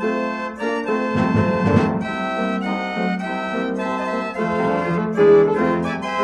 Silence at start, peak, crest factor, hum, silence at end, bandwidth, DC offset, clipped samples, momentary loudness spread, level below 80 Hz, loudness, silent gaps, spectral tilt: 0 s; -2 dBFS; 18 dB; none; 0 s; 9.8 kHz; under 0.1%; under 0.1%; 9 LU; -54 dBFS; -20 LUFS; none; -7.5 dB/octave